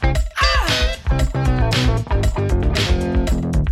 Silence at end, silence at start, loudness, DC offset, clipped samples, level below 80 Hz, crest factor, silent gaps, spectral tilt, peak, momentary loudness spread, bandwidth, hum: 0 s; 0 s; -19 LUFS; under 0.1%; under 0.1%; -20 dBFS; 14 dB; none; -5 dB/octave; -4 dBFS; 4 LU; 14 kHz; none